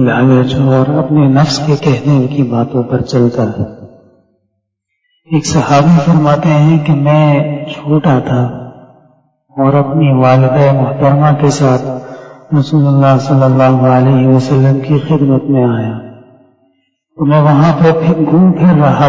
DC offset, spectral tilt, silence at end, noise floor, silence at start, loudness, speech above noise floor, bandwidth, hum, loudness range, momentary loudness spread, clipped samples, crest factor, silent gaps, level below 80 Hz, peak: under 0.1%; -7.5 dB/octave; 0 s; -68 dBFS; 0 s; -10 LUFS; 60 dB; 7.8 kHz; none; 4 LU; 8 LU; under 0.1%; 10 dB; none; -42 dBFS; 0 dBFS